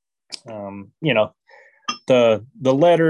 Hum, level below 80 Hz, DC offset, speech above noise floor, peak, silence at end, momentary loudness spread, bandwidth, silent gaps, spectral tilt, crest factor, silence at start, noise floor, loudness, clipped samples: none; -64 dBFS; under 0.1%; 33 dB; -4 dBFS; 0 s; 19 LU; 10.5 kHz; none; -6 dB/octave; 16 dB; 0.3 s; -51 dBFS; -19 LUFS; under 0.1%